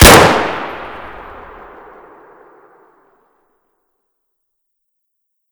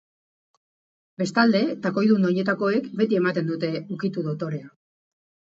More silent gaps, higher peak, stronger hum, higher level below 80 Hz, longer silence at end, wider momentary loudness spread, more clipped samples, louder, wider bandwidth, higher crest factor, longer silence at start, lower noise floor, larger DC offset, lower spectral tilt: neither; first, 0 dBFS vs -4 dBFS; neither; first, -26 dBFS vs -72 dBFS; first, 4.45 s vs 0.9 s; first, 31 LU vs 9 LU; first, 2% vs under 0.1%; first, -10 LUFS vs -23 LUFS; first, over 20 kHz vs 8 kHz; about the same, 16 dB vs 20 dB; second, 0 s vs 1.2 s; second, -71 dBFS vs under -90 dBFS; neither; second, -3.5 dB/octave vs -7 dB/octave